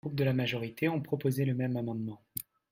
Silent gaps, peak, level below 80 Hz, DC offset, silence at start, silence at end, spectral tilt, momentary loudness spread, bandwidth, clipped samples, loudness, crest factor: none; -16 dBFS; -68 dBFS; under 0.1%; 0.05 s; 0.3 s; -6.5 dB/octave; 10 LU; 16 kHz; under 0.1%; -33 LUFS; 16 dB